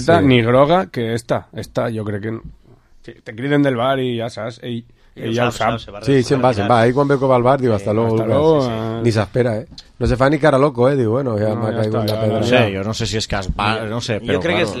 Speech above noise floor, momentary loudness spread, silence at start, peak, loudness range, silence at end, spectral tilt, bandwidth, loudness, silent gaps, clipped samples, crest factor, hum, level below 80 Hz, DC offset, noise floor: 30 dB; 12 LU; 0 s; 0 dBFS; 6 LU; 0 s; -6.5 dB/octave; 13.5 kHz; -17 LUFS; none; under 0.1%; 16 dB; none; -38 dBFS; under 0.1%; -47 dBFS